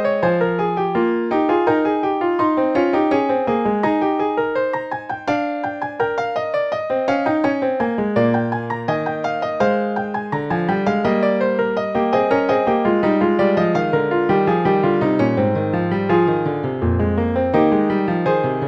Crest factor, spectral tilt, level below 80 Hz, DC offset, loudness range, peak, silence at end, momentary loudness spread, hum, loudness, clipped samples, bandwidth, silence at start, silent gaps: 14 dB; -8.5 dB/octave; -46 dBFS; under 0.1%; 4 LU; -4 dBFS; 0 s; 6 LU; none; -19 LUFS; under 0.1%; 7.4 kHz; 0 s; none